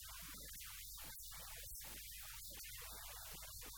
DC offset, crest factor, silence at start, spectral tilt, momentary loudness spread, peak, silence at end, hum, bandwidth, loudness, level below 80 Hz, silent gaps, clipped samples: under 0.1%; 14 dB; 0 s; -1 dB/octave; 1 LU; -38 dBFS; 0 s; none; over 20 kHz; -50 LUFS; -62 dBFS; none; under 0.1%